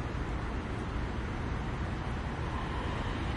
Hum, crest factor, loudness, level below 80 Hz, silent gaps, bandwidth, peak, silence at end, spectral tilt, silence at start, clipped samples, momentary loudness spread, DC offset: none; 12 dB; -36 LUFS; -40 dBFS; none; 11 kHz; -22 dBFS; 0 s; -6.5 dB/octave; 0 s; under 0.1%; 2 LU; under 0.1%